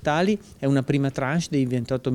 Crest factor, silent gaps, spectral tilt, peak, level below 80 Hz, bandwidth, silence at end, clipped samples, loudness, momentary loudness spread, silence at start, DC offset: 14 dB; none; -6.5 dB/octave; -8 dBFS; -52 dBFS; 12 kHz; 0 s; under 0.1%; -24 LUFS; 3 LU; 0 s; under 0.1%